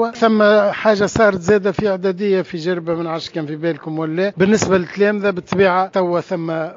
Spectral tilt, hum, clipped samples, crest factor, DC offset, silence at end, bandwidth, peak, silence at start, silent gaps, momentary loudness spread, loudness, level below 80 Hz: -5 dB/octave; none; under 0.1%; 16 dB; under 0.1%; 0 s; 7.6 kHz; 0 dBFS; 0 s; none; 9 LU; -17 LUFS; -48 dBFS